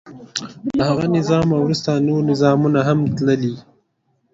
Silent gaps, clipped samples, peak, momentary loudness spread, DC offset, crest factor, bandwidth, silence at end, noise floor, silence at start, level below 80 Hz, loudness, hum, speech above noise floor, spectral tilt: none; under 0.1%; -2 dBFS; 11 LU; under 0.1%; 16 dB; 7.8 kHz; 0.75 s; -66 dBFS; 0.05 s; -50 dBFS; -18 LUFS; none; 49 dB; -7 dB/octave